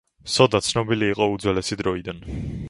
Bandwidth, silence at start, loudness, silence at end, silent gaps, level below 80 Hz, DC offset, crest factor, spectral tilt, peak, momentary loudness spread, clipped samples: 11.5 kHz; 0.25 s; -22 LUFS; 0 s; none; -42 dBFS; under 0.1%; 22 dB; -4.5 dB/octave; 0 dBFS; 13 LU; under 0.1%